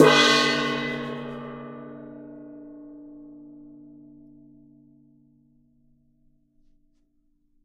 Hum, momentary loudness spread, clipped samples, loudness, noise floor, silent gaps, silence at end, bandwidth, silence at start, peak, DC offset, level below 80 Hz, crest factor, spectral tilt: none; 29 LU; under 0.1%; -22 LUFS; -66 dBFS; none; 4.25 s; 15.5 kHz; 0 s; -2 dBFS; under 0.1%; -66 dBFS; 26 dB; -3.5 dB/octave